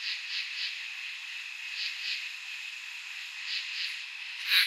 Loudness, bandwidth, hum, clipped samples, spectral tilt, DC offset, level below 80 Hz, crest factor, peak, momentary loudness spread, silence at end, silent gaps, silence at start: -34 LUFS; 16 kHz; none; under 0.1%; 10.5 dB/octave; under 0.1%; under -90 dBFS; 26 dB; -10 dBFS; 6 LU; 0 s; none; 0 s